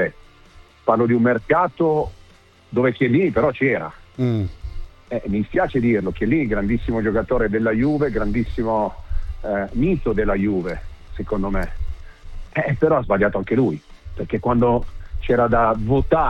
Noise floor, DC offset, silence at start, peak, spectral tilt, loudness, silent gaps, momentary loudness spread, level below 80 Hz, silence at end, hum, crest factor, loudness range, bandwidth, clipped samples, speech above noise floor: -50 dBFS; under 0.1%; 0 s; -2 dBFS; -9 dB/octave; -20 LUFS; none; 15 LU; -32 dBFS; 0 s; none; 18 dB; 3 LU; 6.8 kHz; under 0.1%; 31 dB